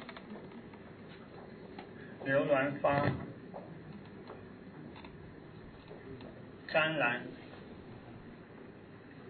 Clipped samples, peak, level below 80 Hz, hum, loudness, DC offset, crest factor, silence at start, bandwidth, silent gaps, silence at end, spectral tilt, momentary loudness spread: under 0.1%; -16 dBFS; -66 dBFS; none; -33 LUFS; under 0.1%; 22 dB; 0 s; 4.5 kHz; none; 0 s; -4 dB/octave; 21 LU